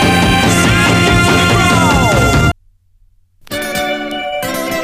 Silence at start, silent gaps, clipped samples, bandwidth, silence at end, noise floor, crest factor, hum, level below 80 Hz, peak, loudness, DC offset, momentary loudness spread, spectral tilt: 0 s; none; under 0.1%; 15.5 kHz; 0 s; -50 dBFS; 12 dB; none; -26 dBFS; 0 dBFS; -11 LUFS; under 0.1%; 10 LU; -4.5 dB/octave